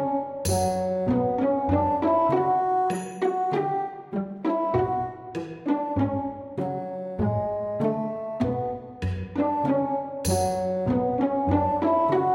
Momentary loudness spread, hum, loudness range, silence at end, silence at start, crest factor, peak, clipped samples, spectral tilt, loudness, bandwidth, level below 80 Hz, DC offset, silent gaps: 9 LU; none; 4 LU; 0 s; 0 s; 16 dB; -10 dBFS; under 0.1%; -6.5 dB/octave; -26 LUFS; 16 kHz; -48 dBFS; under 0.1%; none